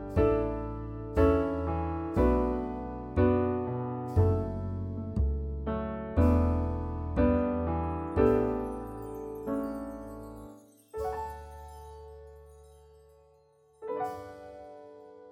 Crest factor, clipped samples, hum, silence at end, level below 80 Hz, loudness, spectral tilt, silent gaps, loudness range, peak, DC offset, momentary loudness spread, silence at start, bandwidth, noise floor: 18 dB; under 0.1%; none; 0 s; -38 dBFS; -30 LUFS; -9.5 dB/octave; none; 14 LU; -12 dBFS; under 0.1%; 21 LU; 0 s; 10.5 kHz; -63 dBFS